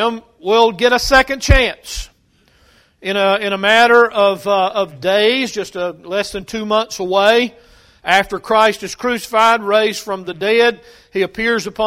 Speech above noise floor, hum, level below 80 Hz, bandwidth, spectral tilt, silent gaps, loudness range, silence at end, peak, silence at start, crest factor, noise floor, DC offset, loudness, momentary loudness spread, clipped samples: 40 dB; none; -30 dBFS; 16 kHz; -4 dB/octave; none; 3 LU; 0 s; 0 dBFS; 0 s; 16 dB; -55 dBFS; under 0.1%; -15 LUFS; 12 LU; under 0.1%